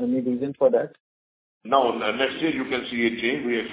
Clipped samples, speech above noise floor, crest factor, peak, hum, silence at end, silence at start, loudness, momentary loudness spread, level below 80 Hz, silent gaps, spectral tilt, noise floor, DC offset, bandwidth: under 0.1%; over 66 dB; 20 dB; -4 dBFS; none; 0 s; 0 s; -24 LUFS; 5 LU; -62 dBFS; 1.00-1.61 s; -8.5 dB/octave; under -90 dBFS; under 0.1%; 4 kHz